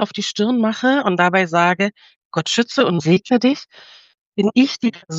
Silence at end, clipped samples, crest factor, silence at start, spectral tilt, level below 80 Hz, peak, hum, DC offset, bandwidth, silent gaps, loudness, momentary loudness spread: 0 s; under 0.1%; 16 dB; 0 s; -5 dB/octave; -66 dBFS; -2 dBFS; none; under 0.1%; 8.2 kHz; 2.16-2.31 s, 4.21-4.32 s; -17 LUFS; 8 LU